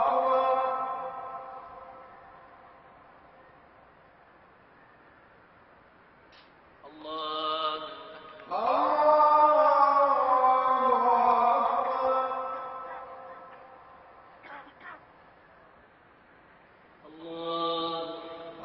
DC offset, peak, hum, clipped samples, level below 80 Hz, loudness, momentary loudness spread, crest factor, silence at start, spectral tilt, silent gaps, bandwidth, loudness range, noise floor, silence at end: under 0.1%; -10 dBFS; none; under 0.1%; -72 dBFS; -26 LUFS; 25 LU; 20 dB; 0 s; -1 dB/octave; none; 5.8 kHz; 22 LU; -58 dBFS; 0 s